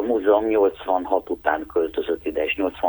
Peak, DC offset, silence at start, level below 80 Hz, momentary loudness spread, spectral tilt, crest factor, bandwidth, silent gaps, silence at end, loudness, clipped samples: -4 dBFS; under 0.1%; 0 s; -50 dBFS; 6 LU; -7 dB/octave; 18 dB; over 20 kHz; none; 0 s; -22 LUFS; under 0.1%